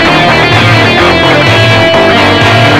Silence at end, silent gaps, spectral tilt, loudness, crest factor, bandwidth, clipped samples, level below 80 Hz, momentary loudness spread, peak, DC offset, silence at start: 0 s; none; -5 dB/octave; -4 LUFS; 6 dB; 15 kHz; 4%; -30 dBFS; 0 LU; 0 dBFS; under 0.1%; 0 s